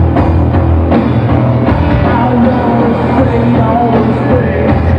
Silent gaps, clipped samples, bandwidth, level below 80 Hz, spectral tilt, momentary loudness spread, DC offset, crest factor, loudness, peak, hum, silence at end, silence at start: none; under 0.1%; 5.4 kHz; -20 dBFS; -10 dB/octave; 1 LU; under 0.1%; 8 dB; -10 LUFS; 0 dBFS; none; 0 s; 0 s